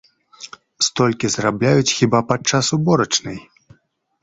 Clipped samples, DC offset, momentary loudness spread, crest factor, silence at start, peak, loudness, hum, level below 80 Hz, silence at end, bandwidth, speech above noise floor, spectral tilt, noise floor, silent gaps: under 0.1%; under 0.1%; 21 LU; 18 dB; 0.4 s; -2 dBFS; -17 LUFS; none; -52 dBFS; 0.8 s; 8.2 kHz; 44 dB; -4 dB/octave; -61 dBFS; none